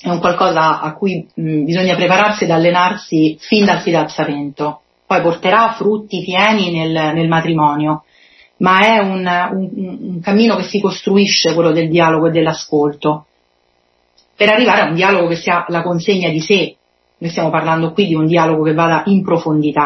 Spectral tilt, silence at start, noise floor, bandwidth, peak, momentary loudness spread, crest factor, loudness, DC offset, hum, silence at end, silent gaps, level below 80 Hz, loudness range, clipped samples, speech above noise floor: -5.5 dB/octave; 0.05 s; -59 dBFS; 6.2 kHz; 0 dBFS; 8 LU; 14 dB; -14 LUFS; under 0.1%; none; 0 s; none; -56 dBFS; 2 LU; under 0.1%; 46 dB